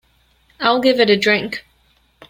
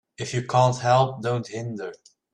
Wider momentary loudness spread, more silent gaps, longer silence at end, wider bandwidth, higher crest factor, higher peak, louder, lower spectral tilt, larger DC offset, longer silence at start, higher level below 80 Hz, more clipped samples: about the same, 13 LU vs 13 LU; neither; first, 0.7 s vs 0.4 s; first, 17 kHz vs 10 kHz; about the same, 18 dB vs 18 dB; first, -2 dBFS vs -6 dBFS; first, -15 LUFS vs -23 LUFS; about the same, -4.5 dB/octave vs -5.5 dB/octave; neither; first, 0.6 s vs 0.2 s; about the same, -58 dBFS vs -62 dBFS; neither